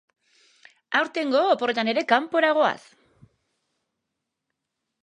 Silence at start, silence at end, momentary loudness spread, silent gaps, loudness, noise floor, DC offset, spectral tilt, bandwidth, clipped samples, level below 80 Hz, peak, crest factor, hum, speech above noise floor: 0.9 s; 2.25 s; 5 LU; none; -22 LUFS; -82 dBFS; under 0.1%; -4 dB/octave; 10 kHz; under 0.1%; -78 dBFS; -4 dBFS; 22 dB; none; 60 dB